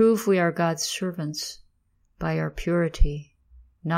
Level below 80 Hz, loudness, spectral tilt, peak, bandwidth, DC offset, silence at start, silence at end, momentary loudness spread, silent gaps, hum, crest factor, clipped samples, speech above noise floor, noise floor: -32 dBFS; -26 LUFS; -5 dB/octave; -6 dBFS; 16 kHz; under 0.1%; 0 s; 0 s; 14 LU; none; none; 18 dB; under 0.1%; 43 dB; -67 dBFS